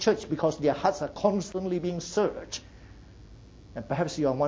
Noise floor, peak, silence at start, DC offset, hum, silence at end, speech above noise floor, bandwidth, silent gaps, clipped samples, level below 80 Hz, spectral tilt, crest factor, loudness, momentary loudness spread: -49 dBFS; -8 dBFS; 0 s; under 0.1%; none; 0 s; 22 dB; 8 kHz; none; under 0.1%; -54 dBFS; -5.5 dB/octave; 20 dB; -29 LUFS; 12 LU